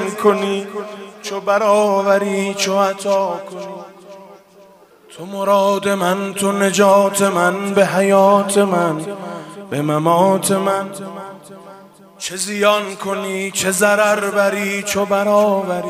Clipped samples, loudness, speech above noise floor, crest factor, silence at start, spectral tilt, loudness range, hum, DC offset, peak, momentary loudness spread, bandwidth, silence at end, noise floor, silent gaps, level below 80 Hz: under 0.1%; -16 LUFS; 30 dB; 16 dB; 0 s; -4 dB/octave; 6 LU; none; under 0.1%; 0 dBFS; 16 LU; 16 kHz; 0 s; -46 dBFS; none; -64 dBFS